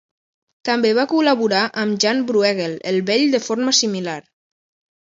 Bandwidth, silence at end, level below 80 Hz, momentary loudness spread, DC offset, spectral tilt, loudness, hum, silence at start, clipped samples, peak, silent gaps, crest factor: 7.8 kHz; 0.85 s; -68 dBFS; 8 LU; under 0.1%; -3.5 dB/octave; -18 LUFS; none; 0.65 s; under 0.1%; -2 dBFS; none; 18 dB